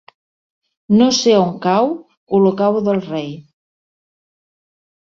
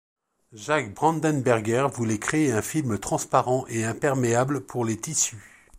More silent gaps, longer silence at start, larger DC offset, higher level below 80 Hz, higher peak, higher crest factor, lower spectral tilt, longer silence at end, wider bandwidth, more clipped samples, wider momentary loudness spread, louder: first, 2.17-2.27 s vs none; first, 0.9 s vs 0.55 s; neither; about the same, -60 dBFS vs -58 dBFS; about the same, -2 dBFS vs -4 dBFS; about the same, 16 dB vs 20 dB; about the same, -5.5 dB/octave vs -5 dB/octave; first, 1.7 s vs 0.3 s; second, 7.6 kHz vs 16 kHz; neither; first, 14 LU vs 5 LU; first, -15 LUFS vs -25 LUFS